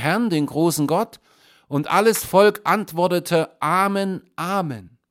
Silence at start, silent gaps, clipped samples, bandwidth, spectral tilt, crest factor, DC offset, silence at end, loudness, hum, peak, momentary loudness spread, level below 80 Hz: 0 s; none; under 0.1%; 16.5 kHz; -5 dB/octave; 18 dB; under 0.1%; 0.25 s; -20 LUFS; none; -2 dBFS; 11 LU; -62 dBFS